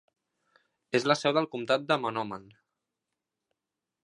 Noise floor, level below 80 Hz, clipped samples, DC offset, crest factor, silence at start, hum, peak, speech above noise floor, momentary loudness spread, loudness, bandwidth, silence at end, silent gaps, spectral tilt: -88 dBFS; -78 dBFS; under 0.1%; under 0.1%; 24 dB; 0.95 s; none; -8 dBFS; 60 dB; 11 LU; -28 LUFS; 11.5 kHz; 1.65 s; none; -4.5 dB/octave